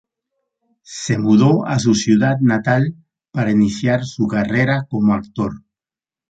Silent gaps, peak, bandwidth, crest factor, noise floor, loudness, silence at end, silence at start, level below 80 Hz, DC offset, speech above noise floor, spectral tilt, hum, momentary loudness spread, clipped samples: none; -2 dBFS; 9 kHz; 14 dB; under -90 dBFS; -17 LUFS; 0.7 s; 0.9 s; -50 dBFS; under 0.1%; over 74 dB; -6.5 dB/octave; none; 11 LU; under 0.1%